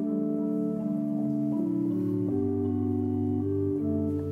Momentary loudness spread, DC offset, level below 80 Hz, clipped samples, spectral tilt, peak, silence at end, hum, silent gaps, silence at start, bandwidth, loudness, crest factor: 1 LU; under 0.1%; -62 dBFS; under 0.1%; -11.5 dB/octave; -18 dBFS; 0 s; none; none; 0 s; 3.1 kHz; -29 LUFS; 10 dB